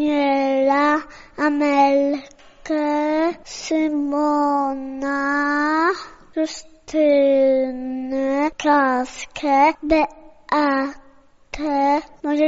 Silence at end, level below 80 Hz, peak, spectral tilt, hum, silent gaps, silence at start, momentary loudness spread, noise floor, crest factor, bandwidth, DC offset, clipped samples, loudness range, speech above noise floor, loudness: 0 s; -50 dBFS; -4 dBFS; -1.5 dB/octave; none; none; 0 s; 11 LU; -50 dBFS; 14 dB; 7.8 kHz; under 0.1%; under 0.1%; 2 LU; 31 dB; -20 LUFS